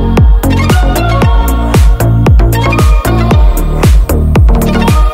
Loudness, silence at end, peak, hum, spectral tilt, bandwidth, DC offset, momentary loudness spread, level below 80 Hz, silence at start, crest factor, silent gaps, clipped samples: -9 LUFS; 0 s; 0 dBFS; none; -6.5 dB/octave; 16.5 kHz; under 0.1%; 2 LU; -8 dBFS; 0 s; 6 dB; none; 0.4%